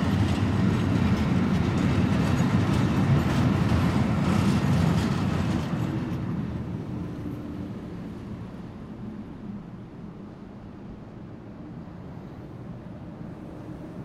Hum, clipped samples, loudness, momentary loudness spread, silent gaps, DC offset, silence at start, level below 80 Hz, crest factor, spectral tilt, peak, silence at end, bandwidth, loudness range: none; under 0.1%; -25 LUFS; 18 LU; none; under 0.1%; 0 s; -42 dBFS; 16 dB; -7.5 dB/octave; -10 dBFS; 0 s; 14 kHz; 17 LU